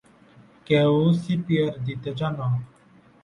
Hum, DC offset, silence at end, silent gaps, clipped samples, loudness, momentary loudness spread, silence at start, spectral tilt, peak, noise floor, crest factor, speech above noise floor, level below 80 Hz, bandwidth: none; under 0.1%; 0.55 s; none; under 0.1%; -24 LUFS; 10 LU; 0.7 s; -8.5 dB/octave; -8 dBFS; -55 dBFS; 16 dB; 32 dB; -58 dBFS; 10 kHz